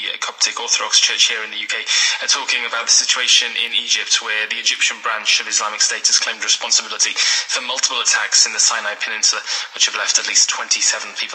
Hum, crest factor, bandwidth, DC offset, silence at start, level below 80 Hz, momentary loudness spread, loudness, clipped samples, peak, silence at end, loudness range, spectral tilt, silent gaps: none; 18 dB; 15 kHz; under 0.1%; 0 s; under -90 dBFS; 7 LU; -15 LUFS; under 0.1%; 0 dBFS; 0 s; 1 LU; 4.5 dB/octave; none